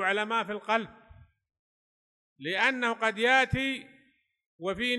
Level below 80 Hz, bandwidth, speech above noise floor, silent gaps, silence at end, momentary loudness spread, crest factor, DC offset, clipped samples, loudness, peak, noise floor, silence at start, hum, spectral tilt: -56 dBFS; 12 kHz; 38 dB; 1.59-2.36 s, 4.46-4.59 s; 0 s; 14 LU; 22 dB; under 0.1%; under 0.1%; -28 LUFS; -10 dBFS; -67 dBFS; 0 s; none; -4 dB/octave